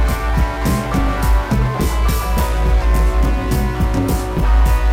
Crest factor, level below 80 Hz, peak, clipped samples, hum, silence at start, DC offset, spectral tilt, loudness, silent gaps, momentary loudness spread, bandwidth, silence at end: 8 dB; -16 dBFS; -6 dBFS; under 0.1%; none; 0 s; under 0.1%; -6 dB/octave; -17 LUFS; none; 3 LU; 16 kHz; 0 s